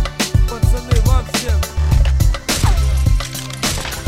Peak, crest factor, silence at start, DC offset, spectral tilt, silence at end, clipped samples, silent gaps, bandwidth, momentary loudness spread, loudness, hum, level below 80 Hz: -2 dBFS; 12 dB; 0 s; 0.5%; -4.5 dB/octave; 0 s; under 0.1%; none; 16.5 kHz; 4 LU; -17 LUFS; none; -16 dBFS